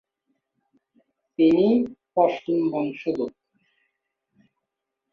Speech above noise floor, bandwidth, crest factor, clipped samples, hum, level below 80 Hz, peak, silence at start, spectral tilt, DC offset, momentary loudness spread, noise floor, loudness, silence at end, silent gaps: 62 dB; 6.2 kHz; 20 dB; under 0.1%; none; -66 dBFS; -6 dBFS; 1.4 s; -8.5 dB/octave; under 0.1%; 11 LU; -83 dBFS; -23 LUFS; 1.85 s; none